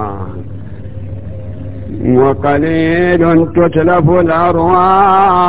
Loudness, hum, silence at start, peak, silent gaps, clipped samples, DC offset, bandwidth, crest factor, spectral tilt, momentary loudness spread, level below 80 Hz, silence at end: -10 LUFS; none; 0 s; 0 dBFS; none; under 0.1%; 4%; 4 kHz; 12 dB; -11.5 dB/octave; 18 LU; -32 dBFS; 0 s